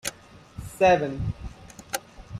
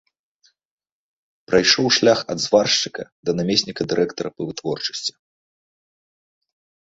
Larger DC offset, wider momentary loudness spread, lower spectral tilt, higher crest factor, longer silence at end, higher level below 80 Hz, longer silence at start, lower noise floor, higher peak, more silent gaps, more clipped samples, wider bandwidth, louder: neither; first, 22 LU vs 13 LU; first, -4.5 dB/octave vs -3 dB/octave; about the same, 20 dB vs 22 dB; second, 0 s vs 1.85 s; first, -44 dBFS vs -58 dBFS; second, 0.05 s vs 1.5 s; second, -47 dBFS vs -63 dBFS; second, -8 dBFS vs -2 dBFS; second, none vs 3.12-3.23 s; neither; first, 16 kHz vs 8 kHz; second, -25 LUFS vs -19 LUFS